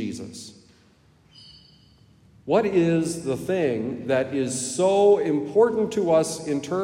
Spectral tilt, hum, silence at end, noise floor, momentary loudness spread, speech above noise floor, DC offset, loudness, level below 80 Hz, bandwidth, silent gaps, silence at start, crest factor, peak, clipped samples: -5.5 dB/octave; none; 0 s; -57 dBFS; 14 LU; 35 dB; under 0.1%; -22 LUFS; -62 dBFS; 15.5 kHz; none; 0 s; 18 dB; -6 dBFS; under 0.1%